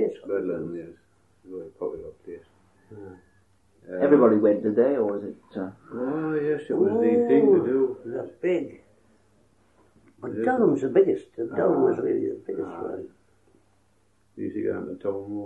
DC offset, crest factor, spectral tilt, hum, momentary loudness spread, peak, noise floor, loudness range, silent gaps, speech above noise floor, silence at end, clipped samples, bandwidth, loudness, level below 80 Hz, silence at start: under 0.1%; 20 dB; -9 dB/octave; none; 21 LU; -6 dBFS; -66 dBFS; 10 LU; none; 42 dB; 0 s; under 0.1%; 7.8 kHz; -24 LUFS; -68 dBFS; 0 s